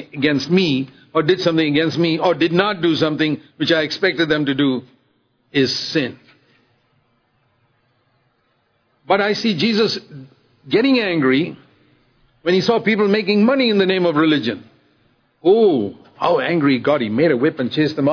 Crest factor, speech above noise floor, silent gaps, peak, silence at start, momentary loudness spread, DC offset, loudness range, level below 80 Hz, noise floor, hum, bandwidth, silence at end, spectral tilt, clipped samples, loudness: 18 dB; 47 dB; none; 0 dBFS; 0 s; 7 LU; under 0.1%; 8 LU; -62 dBFS; -64 dBFS; none; 5.4 kHz; 0 s; -6 dB/octave; under 0.1%; -17 LUFS